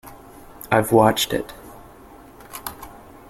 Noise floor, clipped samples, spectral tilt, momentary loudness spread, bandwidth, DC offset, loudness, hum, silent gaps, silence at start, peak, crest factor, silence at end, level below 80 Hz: -45 dBFS; under 0.1%; -4.5 dB/octave; 25 LU; 17 kHz; under 0.1%; -19 LUFS; none; none; 0.05 s; -2 dBFS; 22 dB; 0.35 s; -50 dBFS